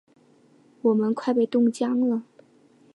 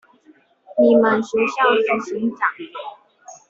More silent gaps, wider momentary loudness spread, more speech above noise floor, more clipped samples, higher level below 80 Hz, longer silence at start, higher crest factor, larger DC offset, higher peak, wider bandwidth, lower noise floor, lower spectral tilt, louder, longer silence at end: neither; second, 4 LU vs 18 LU; about the same, 35 dB vs 36 dB; neither; second, -80 dBFS vs -66 dBFS; first, 0.85 s vs 0.7 s; about the same, 14 dB vs 16 dB; neither; second, -10 dBFS vs -4 dBFS; first, 11 kHz vs 7.8 kHz; first, -58 dBFS vs -54 dBFS; first, -7 dB/octave vs -5 dB/octave; second, -24 LUFS vs -18 LUFS; first, 0.7 s vs 0.15 s